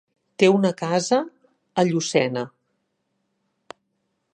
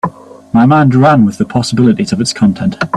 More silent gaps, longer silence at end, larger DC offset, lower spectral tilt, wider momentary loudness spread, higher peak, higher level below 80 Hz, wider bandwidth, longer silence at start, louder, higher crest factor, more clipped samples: neither; first, 1.85 s vs 0 s; neither; second, -5 dB/octave vs -6.5 dB/octave; first, 13 LU vs 7 LU; about the same, -2 dBFS vs 0 dBFS; second, -74 dBFS vs -44 dBFS; second, 10 kHz vs 11.5 kHz; first, 0.4 s vs 0.05 s; second, -21 LUFS vs -10 LUFS; first, 22 dB vs 10 dB; neither